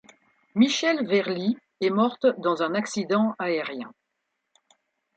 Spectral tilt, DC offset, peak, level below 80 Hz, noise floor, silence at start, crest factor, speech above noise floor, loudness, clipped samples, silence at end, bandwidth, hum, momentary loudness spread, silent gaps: -5 dB/octave; under 0.1%; -8 dBFS; -76 dBFS; -79 dBFS; 0.55 s; 18 dB; 55 dB; -25 LUFS; under 0.1%; 1.25 s; 9 kHz; none; 9 LU; none